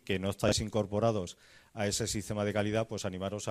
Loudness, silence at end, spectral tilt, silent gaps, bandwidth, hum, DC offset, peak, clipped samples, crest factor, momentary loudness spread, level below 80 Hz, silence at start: -33 LUFS; 0 s; -4.5 dB/octave; none; 15 kHz; none; under 0.1%; -14 dBFS; under 0.1%; 18 dB; 7 LU; -54 dBFS; 0.05 s